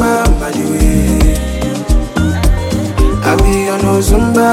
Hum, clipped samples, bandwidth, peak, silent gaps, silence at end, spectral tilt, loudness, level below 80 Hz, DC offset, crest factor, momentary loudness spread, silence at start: none; under 0.1%; 16 kHz; 0 dBFS; none; 0 s; -6 dB/octave; -13 LUFS; -14 dBFS; under 0.1%; 10 dB; 5 LU; 0 s